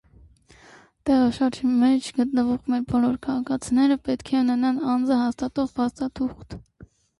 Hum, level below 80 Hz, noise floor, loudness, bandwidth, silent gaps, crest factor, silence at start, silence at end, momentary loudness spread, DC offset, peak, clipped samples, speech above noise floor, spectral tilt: none; -52 dBFS; -53 dBFS; -23 LUFS; 11.5 kHz; none; 12 dB; 1.05 s; 0.6 s; 8 LU; under 0.1%; -12 dBFS; under 0.1%; 31 dB; -5.5 dB/octave